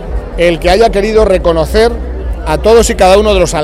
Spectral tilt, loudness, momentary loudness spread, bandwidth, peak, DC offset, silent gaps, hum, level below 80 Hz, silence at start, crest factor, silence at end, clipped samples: -5 dB/octave; -9 LUFS; 12 LU; 15.5 kHz; 0 dBFS; under 0.1%; none; none; -18 dBFS; 0 s; 8 dB; 0 s; 0.6%